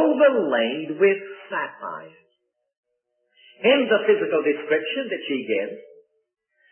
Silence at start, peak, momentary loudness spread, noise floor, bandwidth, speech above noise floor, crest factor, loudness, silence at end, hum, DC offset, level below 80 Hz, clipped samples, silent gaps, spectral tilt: 0 s; -6 dBFS; 15 LU; -74 dBFS; 3.4 kHz; 51 dB; 18 dB; -22 LUFS; 0.9 s; none; under 0.1%; -84 dBFS; under 0.1%; 2.77-2.83 s; -9 dB/octave